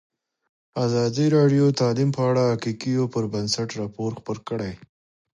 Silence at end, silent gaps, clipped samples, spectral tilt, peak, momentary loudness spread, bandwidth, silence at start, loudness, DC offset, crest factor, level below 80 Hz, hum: 0.65 s; none; under 0.1%; -6.5 dB/octave; -8 dBFS; 12 LU; 11 kHz; 0.75 s; -23 LUFS; under 0.1%; 16 dB; -58 dBFS; none